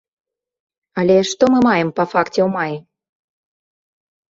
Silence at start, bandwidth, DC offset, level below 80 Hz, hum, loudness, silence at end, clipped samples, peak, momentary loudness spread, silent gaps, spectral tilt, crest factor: 0.95 s; 7.8 kHz; under 0.1%; -58 dBFS; none; -16 LUFS; 1.5 s; under 0.1%; -2 dBFS; 11 LU; none; -5.5 dB/octave; 18 dB